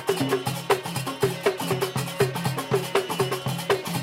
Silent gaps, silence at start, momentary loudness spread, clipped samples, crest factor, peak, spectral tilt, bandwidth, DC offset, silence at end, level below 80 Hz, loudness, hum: none; 0 s; 3 LU; under 0.1%; 20 dB; -6 dBFS; -4.5 dB/octave; 16.5 kHz; under 0.1%; 0 s; -62 dBFS; -26 LUFS; none